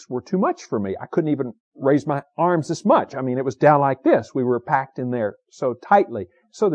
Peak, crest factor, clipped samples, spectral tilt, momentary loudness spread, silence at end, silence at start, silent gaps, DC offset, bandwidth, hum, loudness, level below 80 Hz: -4 dBFS; 18 dB; under 0.1%; -7.5 dB/octave; 9 LU; 0 s; 0.1 s; 1.60-1.72 s; under 0.1%; 9.6 kHz; none; -21 LUFS; -68 dBFS